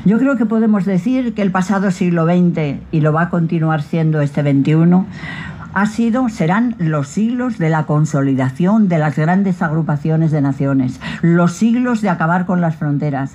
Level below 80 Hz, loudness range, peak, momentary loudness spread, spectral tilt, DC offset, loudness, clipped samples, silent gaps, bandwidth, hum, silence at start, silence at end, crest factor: -48 dBFS; 1 LU; -2 dBFS; 5 LU; -8 dB/octave; under 0.1%; -15 LUFS; under 0.1%; none; 10.5 kHz; none; 0 s; 0 s; 12 dB